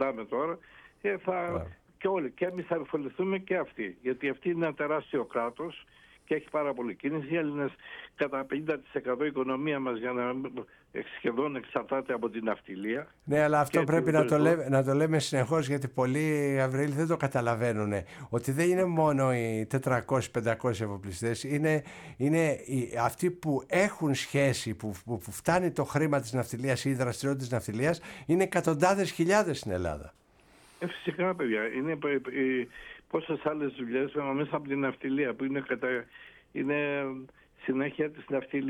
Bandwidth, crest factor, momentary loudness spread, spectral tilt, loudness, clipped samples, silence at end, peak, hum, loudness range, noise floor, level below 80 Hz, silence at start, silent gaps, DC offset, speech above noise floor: 18.5 kHz; 20 dB; 10 LU; -6 dB/octave; -30 LUFS; under 0.1%; 0 s; -10 dBFS; none; 6 LU; -60 dBFS; -62 dBFS; 0 s; none; under 0.1%; 30 dB